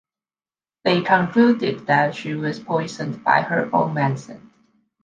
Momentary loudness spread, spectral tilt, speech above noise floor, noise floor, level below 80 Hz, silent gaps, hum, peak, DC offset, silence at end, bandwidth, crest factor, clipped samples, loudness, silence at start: 9 LU; -6.5 dB/octave; over 70 dB; under -90 dBFS; -64 dBFS; none; none; -2 dBFS; under 0.1%; 0.65 s; 7.6 kHz; 20 dB; under 0.1%; -20 LUFS; 0.85 s